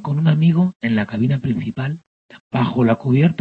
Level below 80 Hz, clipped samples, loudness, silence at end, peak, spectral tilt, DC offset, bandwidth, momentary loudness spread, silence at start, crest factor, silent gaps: -54 dBFS; under 0.1%; -18 LUFS; 0.05 s; -4 dBFS; -9.5 dB/octave; under 0.1%; 4.6 kHz; 11 LU; 0 s; 14 dB; 0.76-0.80 s, 2.07-2.29 s, 2.40-2.51 s